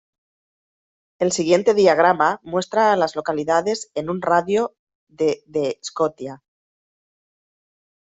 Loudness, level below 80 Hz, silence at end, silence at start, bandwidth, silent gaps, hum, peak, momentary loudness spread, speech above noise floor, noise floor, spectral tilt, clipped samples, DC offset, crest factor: -20 LUFS; -62 dBFS; 1.7 s; 1.2 s; 8.2 kHz; 4.79-4.87 s, 4.95-5.07 s; none; -2 dBFS; 10 LU; over 71 dB; under -90 dBFS; -4.5 dB/octave; under 0.1%; under 0.1%; 18 dB